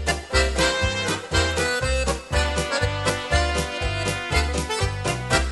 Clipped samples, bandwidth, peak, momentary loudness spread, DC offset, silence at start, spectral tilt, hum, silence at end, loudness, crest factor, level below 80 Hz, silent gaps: under 0.1%; 12 kHz; -4 dBFS; 4 LU; under 0.1%; 0 s; -3.5 dB/octave; none; 0 s; -23 LUFS; 18 dB; -30 dBFS; none